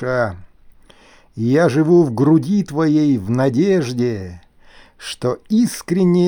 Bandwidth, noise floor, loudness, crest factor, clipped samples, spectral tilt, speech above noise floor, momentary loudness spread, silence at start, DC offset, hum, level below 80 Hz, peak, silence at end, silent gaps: over 20 kHz; -48 dBFS; -17 LUFS; 14 dB; under 0.1%; -7 dB/octave; 32 dB; 12 LU; 0 s; under 0.1%; none; -52 dBFS; -4 dBFS; 0 s; none